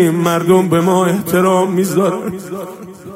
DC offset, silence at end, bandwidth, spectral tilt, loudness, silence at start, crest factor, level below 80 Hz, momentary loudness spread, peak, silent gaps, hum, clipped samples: under 0.1%; 0 s; 16 kHz; -6 dB/octave; -14 LUFS; 0 s; 14 dB; -56 dBFS; 15 LU; 0 dBFS; none; none; under 0.1%